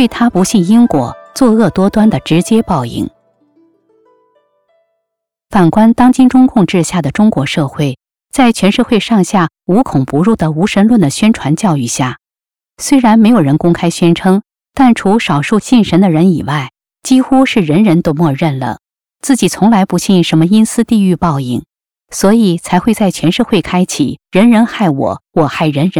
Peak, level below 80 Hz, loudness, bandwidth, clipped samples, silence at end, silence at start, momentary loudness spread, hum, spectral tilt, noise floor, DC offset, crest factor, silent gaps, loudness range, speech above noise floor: 0 dBFS; -40 dBFS; -11 LUFS; 15.5 kHz; under 0.1%; 0 s; 0 s; 9 LU; none; -6 dB/octave; under -90 dBFS; 0.6%; 10 dB; none; 3 LU; over 80 dB